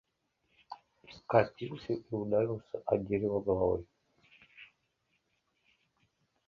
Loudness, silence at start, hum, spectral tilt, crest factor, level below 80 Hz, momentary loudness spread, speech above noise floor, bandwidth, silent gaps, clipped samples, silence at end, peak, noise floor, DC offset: -33 LUFS; 0.7 s; none; -9 dB/octave; 26 dB; -60 dBFS; 22 LU; 47 dB; 6.8 kHz; none; under 0.1%; 1.85 s; -10 dBFS; -79 dBFS; under 0.1%